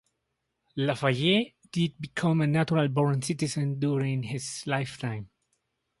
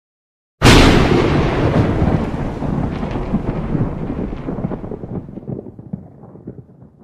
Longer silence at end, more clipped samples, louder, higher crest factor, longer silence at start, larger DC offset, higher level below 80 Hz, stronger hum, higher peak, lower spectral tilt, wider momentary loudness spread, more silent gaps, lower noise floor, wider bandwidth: first, 0.75 s vs 0.4 s; neither; second, -28 LUFS vs -16 LUFS; about the same, 18 dB vs 18 dB; first, 0.75 s vs 0.6 s; neither; second, -64 dBFS vs -24 dBFS; neither; second, -10 dBFS vs 0 dBFS; about the same, -5.5 dB/octave vs -6 dB/octave; second, 9 LU vs 21 LU; neither; first, -80 dBFS vs -40 dBFS; second, 11.5 kHz vs 15 kHz